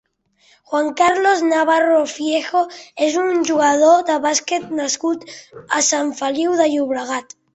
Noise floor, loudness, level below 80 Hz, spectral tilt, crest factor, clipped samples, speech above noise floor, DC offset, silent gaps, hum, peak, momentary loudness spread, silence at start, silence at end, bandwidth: -57 dBFS; -17 LUFS; -64 dBFS; -1.5 dB/octave; 16 dB; under 0.1%; 40 dB; under 0.1%; none; none; -2 dBFS; 10 LU; 0.7 s; 0.35 s; 8.4 kHz